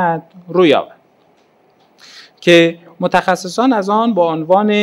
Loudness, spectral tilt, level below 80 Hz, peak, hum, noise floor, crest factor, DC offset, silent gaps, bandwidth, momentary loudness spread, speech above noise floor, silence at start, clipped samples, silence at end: -14 LUFS; -5.5 dB/octave; -60 dBFS; 0 dBFS; none; -53 dBFS; 14 dB; under 0.1%; none; 12.5 kHz; 10 LU; 40 dB; 0 s; under 0.1%; 0 s